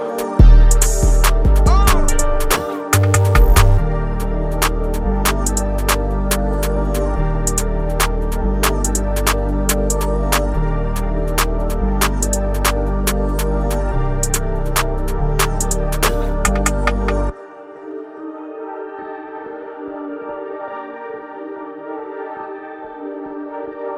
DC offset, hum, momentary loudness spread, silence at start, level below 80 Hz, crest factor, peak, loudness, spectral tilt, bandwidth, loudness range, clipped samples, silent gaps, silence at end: under 0.1%; none; 16 LU; 0 s; -18 dBFS; 16 dB; 0 dBFS; -18 LUFS; -4.5 dB/octave; 16 kHz; 14 LU; under 0.1%; none; 0 s